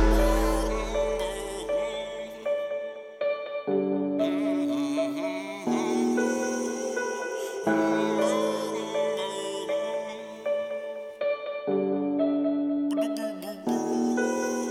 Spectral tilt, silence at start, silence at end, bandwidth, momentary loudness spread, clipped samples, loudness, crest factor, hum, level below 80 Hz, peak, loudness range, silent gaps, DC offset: -5 dB/octave; 0 s; 0 s; 16 kHz; 8 LU; under 0.1%; -28 LUFS; 16 dB; none; -38 dBFS; -12 dBFS; 3 LU; none; under 0.1%